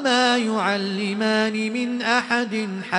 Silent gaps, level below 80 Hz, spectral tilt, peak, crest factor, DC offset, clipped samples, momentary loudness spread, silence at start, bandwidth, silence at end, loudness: none; -70 dBFS; -4 dB/octave; -4 dBFS; 16 dB; under 0.1%; under 0.1%; 6 LU; 0 s; 10.5 kHz; 0 s; -22 LUFS